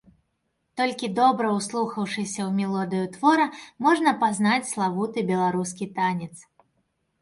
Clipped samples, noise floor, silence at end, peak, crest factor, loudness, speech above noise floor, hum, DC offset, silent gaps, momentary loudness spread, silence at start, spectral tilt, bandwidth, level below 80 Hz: under 0.1%; -75 dBFS; 0.8 s; -6 dBFS; 18 dB; -24 LUFS; 51 dB; none; under 0.1%; none; 8 LU; 0.75 s; -5 dB/octave; 11.5 kHz; -68 dBFS